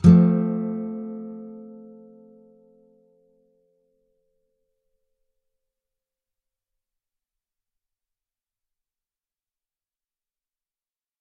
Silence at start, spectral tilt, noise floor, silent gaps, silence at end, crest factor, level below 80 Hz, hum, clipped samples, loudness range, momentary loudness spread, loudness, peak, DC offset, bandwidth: 0.05 s; -11 dB/octave; under -90 dBFS; none; 9.45 s; 26 dB; -54 dBFS; none; under 0.1%; 27 LU; 27 LU; -22 LUFS; -2 dBFS; under 0.1%; 5.4 kHz